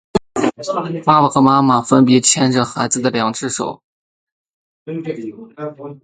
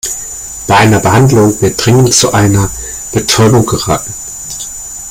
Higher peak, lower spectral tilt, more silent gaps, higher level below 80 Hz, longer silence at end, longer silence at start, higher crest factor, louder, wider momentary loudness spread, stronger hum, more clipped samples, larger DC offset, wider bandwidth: about the same, 0 dBFS vs 0 dBFS; about the same, -4.5 dB/octave vs -4.5 dB/octave; first, 3.84-4.45 s, 4.53-4.86 s vs none; second, -52 dBFS vs -32 dBFS; about the same, 0.1 s vs 0 s; about the same, 0.15 s vs 0.05 s; first, 16 dB vs 10 dB; second, -15 LUFS vs -9 LUFS; first, 17 LU vs 14 LU; neither; neither; neither; second, 9.6 kHz vs 17 kHz